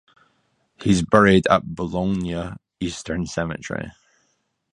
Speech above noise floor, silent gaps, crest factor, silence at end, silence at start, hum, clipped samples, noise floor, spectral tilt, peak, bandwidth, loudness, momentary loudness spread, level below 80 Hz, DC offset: 49 dB; none; 22 dB; 0.85 s; 0.8 s; none; under 0.1%; -70 dBFS; -6 dB/octave; 0 dBFS; 11 kHz; -21 LUFS; 16 LU; -44 dBFS; under 0.1%